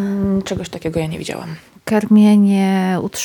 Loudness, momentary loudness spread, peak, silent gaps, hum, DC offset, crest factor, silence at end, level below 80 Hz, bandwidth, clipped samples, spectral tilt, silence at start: -16 LUFS; 16 LU; -4 dBFS; none; none; under 0.1%; 12 dB; 0 s; -46 dBFS; 19 kHz; under 0.1%; -6.5 dB/octave; 0 s